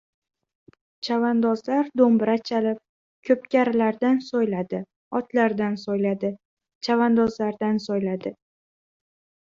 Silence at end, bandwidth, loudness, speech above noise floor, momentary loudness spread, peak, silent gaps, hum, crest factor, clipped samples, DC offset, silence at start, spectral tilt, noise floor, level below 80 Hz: 1.2 s; 7.2 kHz; -23 LUFS; over 68 dB; 12 LU; -6 dBFS; 2.89-3.23 s, 4.96-5.11 s, 6.45-6.57 s, 6.75-6.81 s; none; 18 dB; under 0.1%; under 0.1%; 1.05 s; -7 dB/octave; under -90 dBFS; -66 dBFS